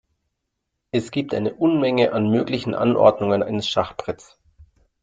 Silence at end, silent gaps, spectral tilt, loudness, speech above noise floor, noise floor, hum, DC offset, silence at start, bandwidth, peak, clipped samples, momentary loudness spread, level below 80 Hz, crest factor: 0.4 s; none; -6.5 dB/octave; -21 LUFS; 58 dB; -78 dBFS; none; under 0.1%; 0.95 s; 9 kHz; -2 dBFS; under 0.1%; 11 LU; -58 dBFS; 20 dB